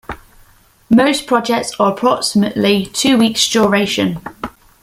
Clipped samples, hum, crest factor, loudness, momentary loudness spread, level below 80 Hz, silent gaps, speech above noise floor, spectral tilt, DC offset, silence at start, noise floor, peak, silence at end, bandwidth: under 0.1%; none; 16 dB; -14 LUFS; 17 LU; -48 dBFS; none; 35 dB; -4 dB/octave; under 0.1%; 0.1 s; -49 dBFS; 0 dBFS; 0.35 s; 16 kHz